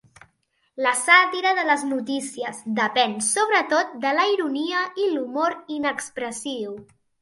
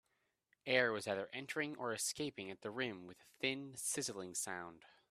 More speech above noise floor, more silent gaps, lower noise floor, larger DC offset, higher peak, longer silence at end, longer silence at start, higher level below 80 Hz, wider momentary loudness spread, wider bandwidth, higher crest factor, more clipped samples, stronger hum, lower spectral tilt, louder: first, 46 dB vs 41 dB; neither; second, -69 dBFS vs -83 dBFS; neither; first, -2 dBFS vs -18 dBFS; first, 0.4 s vs 0.25 s; about the same, 0.75 s vs 0.65 s; first, -72 dBFS vs -82 dBFS; about the same, 14 LU vs 13 LU; second, 12 kHz vs 15 kHz; about the same, 20 dB vs 24 dB; neither; neither; about the same, -1.5 dB/octave vs -2.5 dB/octave; first, -22 LUFS vs -40 LUFS